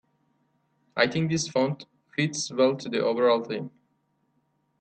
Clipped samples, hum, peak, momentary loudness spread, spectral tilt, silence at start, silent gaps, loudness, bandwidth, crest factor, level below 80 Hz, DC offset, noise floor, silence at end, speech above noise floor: under 0.1%; none; -6 dBFS; 12 LU; -4.5 dB/octave; 0.95 s; none; -26 LUFS; 9 kHz; 22 dB; -68 dBFS; under 0.1%; -72 dBFS; 1.15 s; 47 dB